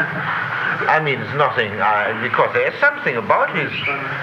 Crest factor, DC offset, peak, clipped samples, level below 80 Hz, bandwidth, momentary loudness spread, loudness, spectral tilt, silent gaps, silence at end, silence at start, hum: 16 dB; under 0.1%; -2 dBFS; under 0.1%; -58 dBFS; 15 kHz; 4 LU; -18 LUFS; -6.5 dB/octave; none; 0 s; 0 s; none